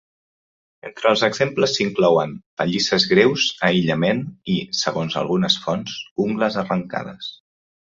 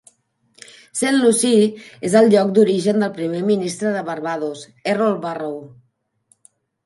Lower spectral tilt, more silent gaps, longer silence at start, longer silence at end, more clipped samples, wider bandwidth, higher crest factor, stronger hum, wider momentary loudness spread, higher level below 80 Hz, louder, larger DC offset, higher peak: about the same, -4.5 dB/octave vs -5 dB/octave; first, 2.46-2.57 s, 6.11-6.16 s vs none; about the same, 0.85 s vs 0.95 s; second, 0.5 s vs 1.2 s; neither; second, 7.8 kHz vs 11.5 kHz; about the same, 20 dB vs 18 dB; neither; about the same, 12 LU vs 14 LU; first, -58 dBFS vs -68 dBFS; about the same, -20 LUFS vs -18 LUFS; neither; about the same, -2 dBFS vs 0 dBFS